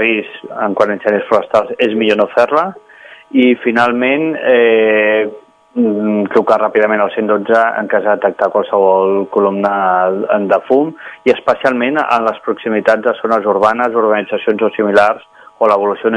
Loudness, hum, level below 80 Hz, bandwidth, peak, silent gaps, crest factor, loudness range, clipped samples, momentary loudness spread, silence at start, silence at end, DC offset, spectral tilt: -13 LUFS; none; -60 dBFS; 10 kHz; 0 dBFS; none; 12 dB; 1 LU; 0.2%; 6 LU; 0 s; 0 s; under 0.1%; -6.5 dB/octave